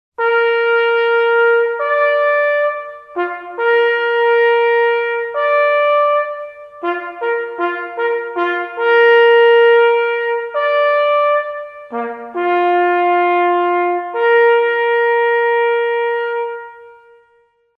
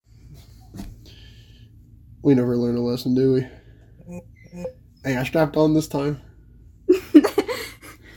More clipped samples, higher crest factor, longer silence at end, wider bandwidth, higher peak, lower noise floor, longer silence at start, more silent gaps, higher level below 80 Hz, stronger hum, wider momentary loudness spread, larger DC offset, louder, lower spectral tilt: neither; second, 12 dB vs 22 dB; first, 0.85 s vs 0.25 s; second, 5 kHz vs 17 kHz; about the same, -2 dBFS vs 0 dBFS; first, -56 dBFS vs -48 dBFS; about the same, 0.2 s vs 0.25 s; neither; second, -70 dBFS vs -48 dBFS; neither; second, 12 LU vs 24 LU; neither; first, -14 LUFS vs -20 LUFS; second, -4 dB/octave vs -7 dB/octave